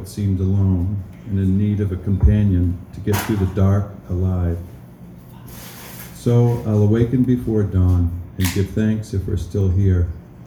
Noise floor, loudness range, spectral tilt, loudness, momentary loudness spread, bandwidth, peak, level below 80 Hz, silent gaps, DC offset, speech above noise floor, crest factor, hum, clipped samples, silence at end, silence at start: -39 dBFS; 4 LU; -8 dB/octave; -19 LUFS; 17 LU; over 20 kHz; -2 dBFS; -32 dBFS; none; under 0.1%; 22 dB; 16 dB; none; under 0.1%; 0 s; 0 s